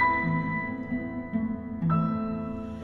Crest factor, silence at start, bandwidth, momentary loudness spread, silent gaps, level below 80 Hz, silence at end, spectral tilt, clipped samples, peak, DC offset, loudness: 16 dB; 0 s; 4.3 kHz; 7 LU; none; -50 dBFS; 0 s; -9.5 dB/octave; under 0.1%; -12 dBFS; under 0.1%; -29 LUFS